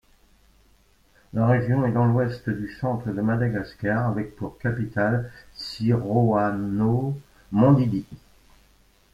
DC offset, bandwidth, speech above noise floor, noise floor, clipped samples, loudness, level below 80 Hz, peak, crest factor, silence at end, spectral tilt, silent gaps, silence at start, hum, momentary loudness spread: under 0.1%; 7.4 kHz; 36 dB; -59 dBFS; under 0.1%; -24 LUFS; -52 dBFS; -4 dBFS; 20 dB; 0.95 s; -9 dB/octave; none; 1.35 s; none; 11 LU